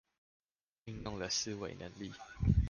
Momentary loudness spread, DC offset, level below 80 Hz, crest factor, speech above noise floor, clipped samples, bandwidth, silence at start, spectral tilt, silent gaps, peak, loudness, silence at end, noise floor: 13 LU; under 0.1%; -44 dBFS; 22 dB; 18 dB; under 0.1%; 10 kHz; 0.85 s; -4.5 dB/octave; none; -16 dBFS; -39 LUFS; 0 s; -56 dBFS